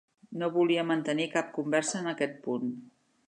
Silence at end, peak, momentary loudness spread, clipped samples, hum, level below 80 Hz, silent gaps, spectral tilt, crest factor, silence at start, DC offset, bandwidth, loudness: 0.4 s; -12 dBFS; 9 LU; under 0.1%; none; -82 dBFS; none; -4.5 dB/octave; 18 dB; 0.3 s; under 0.1%; 11 kHz; -30 LUFS